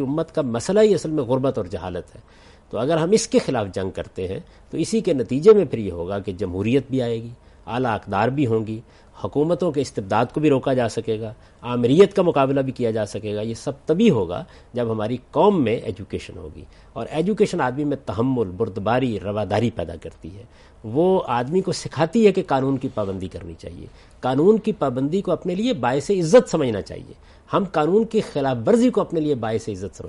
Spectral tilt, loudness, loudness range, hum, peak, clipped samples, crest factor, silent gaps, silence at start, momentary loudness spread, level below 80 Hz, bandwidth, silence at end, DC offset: -6.5 dB/octave; -21 LUFS; 4 LU; none; -2 dBFS; under 0.1%; 18 dB; none; 0 s; 15 LU; -50 dBFS; 11.5 kHz; 0 s; under 0.1%